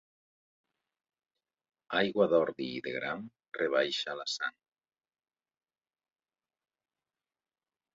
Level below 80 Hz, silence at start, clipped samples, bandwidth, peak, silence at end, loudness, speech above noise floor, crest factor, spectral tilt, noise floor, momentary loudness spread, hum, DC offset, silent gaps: -78 dBFS; 1.9 s; under 0.1%; 7.4 kHz; -14 dBFS; 3.45 s; -32 LUFS; over 58 dB; 22 dB; -2 dB/octave; under -90 dBFS; 11 LU; none; under 0.1%; 3.48-3.52 s